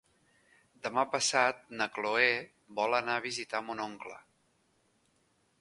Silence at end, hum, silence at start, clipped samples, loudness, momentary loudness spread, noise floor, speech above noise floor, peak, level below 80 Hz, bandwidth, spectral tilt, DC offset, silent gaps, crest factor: 1.4 s; none; 0.85 s; under 0.1%; -31 LUFS; 14 LU; -73 dBFS; 40 dB; -10 dBFS; -78 dBFS; 11.5 kHz; -1.5 dB/octave; under 0.1%; none; 24 dB